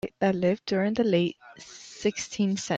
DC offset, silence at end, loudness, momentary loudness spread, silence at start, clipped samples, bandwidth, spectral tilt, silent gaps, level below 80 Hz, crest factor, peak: under 0.1%; 0 s; -27 LUFS; 19 LU; 0.05 s; under 0.1%; 8.4 kHz; -5.5 dB/octave; none; -62 dBFS; 16 dB; -12 dBFS